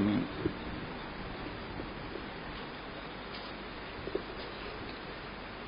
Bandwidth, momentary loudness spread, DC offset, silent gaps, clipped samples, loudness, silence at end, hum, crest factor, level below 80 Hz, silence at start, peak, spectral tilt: 5.2 kHz; 6 LU; under 0.1%; none; under 0.1%; -40 LUFS; 0 s; none; 20 dB; -52 dBFS; 0 s; -18 dBFS; -4 dB/octave